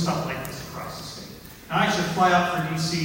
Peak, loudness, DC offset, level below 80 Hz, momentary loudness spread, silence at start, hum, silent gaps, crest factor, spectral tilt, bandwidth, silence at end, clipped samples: -6 dBFS; -24 LUFS; under 0.1%; -52 dBFS; 18 LU; 0 s; none; none; 18 dB; -4.5 dB/octave; 16.5 kHz; 0 s; under 0.1%